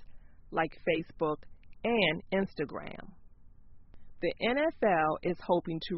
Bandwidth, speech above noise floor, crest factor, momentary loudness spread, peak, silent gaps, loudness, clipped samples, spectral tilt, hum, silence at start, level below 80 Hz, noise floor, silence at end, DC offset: 5.8 kHz; 21 dB; 18 dB; 10 LU; -14 dBFS; none; -32 LUFS; under 0.1%; -3.5 dB/octave; none; 0 s; -54 dBFS; -52 dBFS; 0 s; under 0.1%